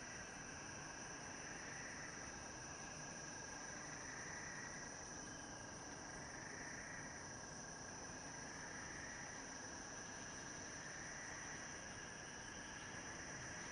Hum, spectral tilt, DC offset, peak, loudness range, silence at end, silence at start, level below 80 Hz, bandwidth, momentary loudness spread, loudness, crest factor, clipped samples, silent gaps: none; -2 dB/octave; under 0.1%; -38 dBFS; 1 LU; 0 s; 0 s; -68 dBFS; 11.5 kHz; 2 LU; -50 LUFS; 14 dB; under 0.1%; none